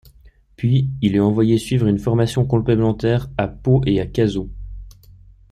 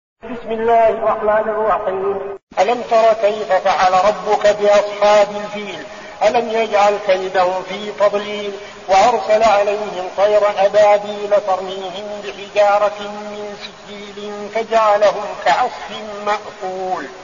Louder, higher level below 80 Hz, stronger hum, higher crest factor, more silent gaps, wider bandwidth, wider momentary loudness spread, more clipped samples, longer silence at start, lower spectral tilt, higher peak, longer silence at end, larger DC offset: about the same, -18 LUFS vs -16 LUFS; first, -38 dBFS vs -52 dBFS; neither; about the same, 14 dB vs 14 dB; second, none vs 2.43-2.47 s; first, 13 kHz vs 7.4 kHz; second, 8 LU vs 15 LU; neither; first, 0.6 s vs 0.25 s; first, -8 dB/octave vs -1.5 dB/octave; about the same, -4 dBFS vs -2 dBFS; first, 0.4 s vs 0 s; second, under 0.1% vs 0.2%